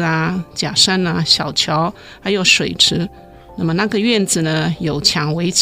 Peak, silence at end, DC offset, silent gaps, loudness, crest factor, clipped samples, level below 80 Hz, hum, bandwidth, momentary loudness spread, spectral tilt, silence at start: 0 dBFS; 0 s; under 0.1%; none; -15 LUFS; 16 dB; under 0.1%; -46 dBFS; none; 16 kHz; 10 LU; -3.5 dB/octave; 0 s